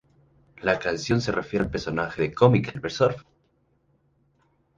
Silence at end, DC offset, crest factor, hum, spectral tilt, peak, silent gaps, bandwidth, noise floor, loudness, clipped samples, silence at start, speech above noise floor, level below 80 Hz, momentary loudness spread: 1.55 s; under 0.1%; 22 dB; none; -6.5 dB/octave; -4 dBFS; none; 7.6 kHz; -67 dBFS; -24 LUFS; under 0.1%; 0.6 s; 43 dB; -50 dBFS; 9 LU